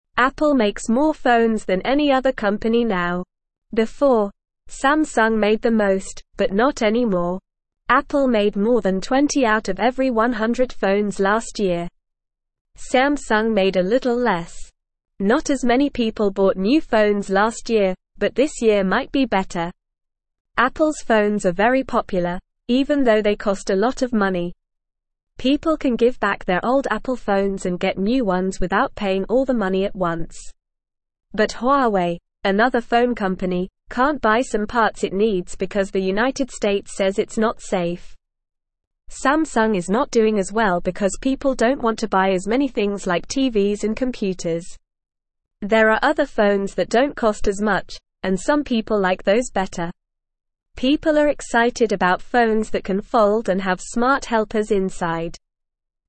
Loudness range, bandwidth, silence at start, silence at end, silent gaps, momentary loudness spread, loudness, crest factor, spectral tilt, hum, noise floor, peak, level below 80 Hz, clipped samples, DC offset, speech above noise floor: 3 LU; 8.8 kHz; 0.15 s; 0.7 s; 3.58-3.62 s, 12.61-12.65 s, 20.40-20.45 s, 38.87-38.91 s; 7 LU; -20 LUFS; 18 dB; -5 dB/octave; none; -80 dBFS; -2 dBFS; -42 dBFS; under 0.1%; 0.4%; 61 dB